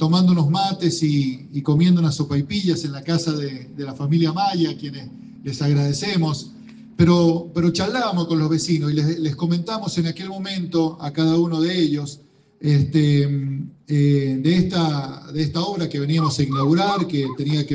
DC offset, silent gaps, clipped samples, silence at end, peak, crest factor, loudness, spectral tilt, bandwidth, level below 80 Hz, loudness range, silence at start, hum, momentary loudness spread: under 0.1%; none; under 0.1%; 0 s; -4 dBFS; 16 dB; -20 LUFS; -6.5 dB/octave; 9.4 kHz; -56 dBFS; 3 LU; 0 s; none; 11 LU